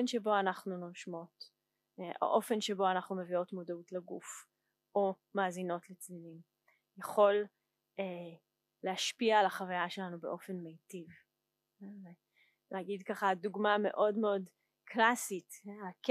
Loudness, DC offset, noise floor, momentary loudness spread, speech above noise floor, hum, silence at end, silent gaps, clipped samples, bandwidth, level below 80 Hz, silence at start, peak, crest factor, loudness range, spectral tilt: -35 LUFS; under 0.1%; -87 dBFS; 20 LU; 51 dB; none; 0 s; none; under 0.1%; 15 kHz; under -90 dBFS; 0 s; -14 dBFS; 22 dB; 6 LU; -4 dB/octave